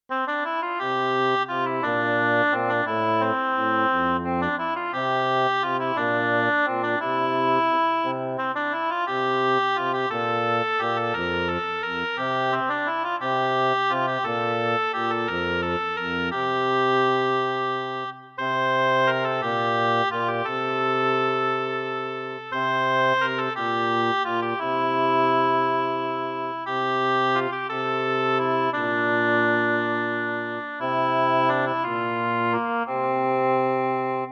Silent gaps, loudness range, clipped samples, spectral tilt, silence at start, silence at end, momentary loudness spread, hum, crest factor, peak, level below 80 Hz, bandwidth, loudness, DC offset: none; 2 LU; under 0.1%; -6 dB/octave; 0.1 s; 0 s; 6 LU; none; 14 dB; -10 dBFS; -62 dBFS; 7.2 kHz; -23 LUFS; under 0.1%